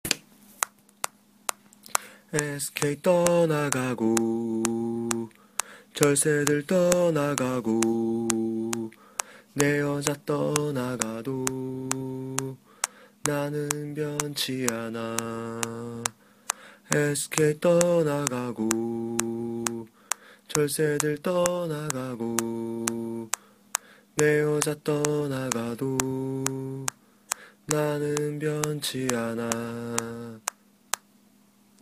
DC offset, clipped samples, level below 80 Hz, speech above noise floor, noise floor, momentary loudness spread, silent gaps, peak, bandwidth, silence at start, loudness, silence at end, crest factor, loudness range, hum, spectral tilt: under 0.1%; under 0.1%; -64 dBFS; 33 dB; -60 dBFS; 11 LU; none; 0 dBFS; 15.5 kHz; 0.05 s; -27 LUFS; 0.85 s; 28 dB; 5 LU; none; -4 dB/octave